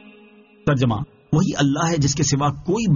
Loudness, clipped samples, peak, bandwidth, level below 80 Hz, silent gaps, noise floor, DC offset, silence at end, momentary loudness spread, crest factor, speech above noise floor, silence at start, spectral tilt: -20 LUFS; under 0.1%; -6 dBFS; 7.4 kHz; -44 dBFS; none; -49 dBFS; under 0.1%; 0 s; 4 LU; 14 dB; 30 dB; 0.65 s; -6 dB/octave